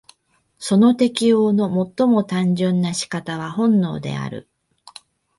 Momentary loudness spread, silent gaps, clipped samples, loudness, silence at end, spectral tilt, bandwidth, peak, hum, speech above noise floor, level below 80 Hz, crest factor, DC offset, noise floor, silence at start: 11 LU; none; under 0.1%; -19 LUFS; 1 s; -6 dB/octave; 11.5 kHz; -4 dBFS; none; 45 dB; -60 dBFS; 16 dB; under 0.1%; -63 dBFS; 0.6 s